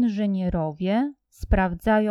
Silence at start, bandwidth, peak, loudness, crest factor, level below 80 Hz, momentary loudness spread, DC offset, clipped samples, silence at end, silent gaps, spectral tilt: 0 s; 13 kHz; -6 dBFS; -24 LUFS; 16 dB; -32 dBFS; 6 LU; under 0.1%; under 0.1%; 0 s; none; -8 dB/octave